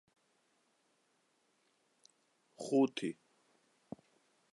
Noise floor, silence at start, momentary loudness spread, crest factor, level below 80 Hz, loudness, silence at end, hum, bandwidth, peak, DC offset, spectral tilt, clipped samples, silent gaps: -77 dBFS; 2.6 s; 22 LU; 22 dB; -88 dBFS; -35 LUFS; 1.4 s; none; 11.5 kHz; -20 dBFS; under 0.1%; -5.5 dB/octave; under 0.1%; none